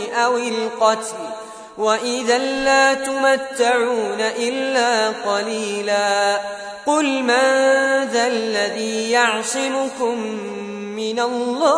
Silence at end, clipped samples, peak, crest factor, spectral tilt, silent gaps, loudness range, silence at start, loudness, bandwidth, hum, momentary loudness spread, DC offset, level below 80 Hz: 0 s; under 0.1%; -2 dBFS; 16 dB; -2 dB/octave; none; 2 LU; 0 s; -19 LUFS; 11 kHz; none; 10 LU; under 0.1%; -60 dBFS